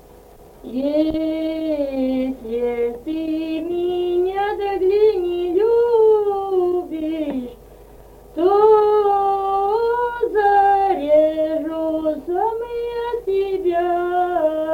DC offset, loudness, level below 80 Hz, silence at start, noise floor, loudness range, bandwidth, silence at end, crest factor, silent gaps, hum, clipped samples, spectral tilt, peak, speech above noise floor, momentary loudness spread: under 0.1%; -19 LUFS; -48 dBFS; 0.65 s; -44 dBFS; 5 LU; 16.5 kHz; 0 s; 16 dB; none; none; under 0.1%; -6.5 dB/octave; -4 dBFS; 23 dB; 10 LU